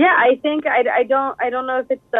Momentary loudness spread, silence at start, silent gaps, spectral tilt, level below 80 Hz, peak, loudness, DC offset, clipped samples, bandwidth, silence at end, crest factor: 8 LU; 0 s; none; -6 dB/octave; -62 dBFS; -2 dBFS; -18 LUFS; under 0.1%; under 0.1%; 4 kHz; 0 s; 14 dB